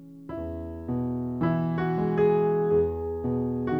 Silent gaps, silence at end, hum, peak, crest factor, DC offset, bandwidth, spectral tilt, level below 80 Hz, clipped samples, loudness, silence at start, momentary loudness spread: none; 0 s; none; -12 dBFS; 14 dB; under 0.1%; 4.8 kHz; -10.5 dB/octave; -48 dBFS; under 0.1%; -27 LUFS; 0 s; 13 LU